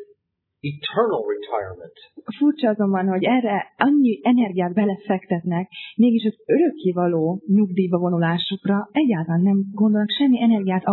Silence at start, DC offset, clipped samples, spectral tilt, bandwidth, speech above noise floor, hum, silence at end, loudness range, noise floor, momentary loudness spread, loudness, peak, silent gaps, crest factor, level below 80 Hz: 0 s; under 0.1%; under 0.1%; -10.5 dB/octave; 4.3 kHz; 56 dB; none; 0 s; 2 LU; -76 dBFS; 9 LU; -20 LUFS; -2 dBFS; none; 18 dB; -70 dBFS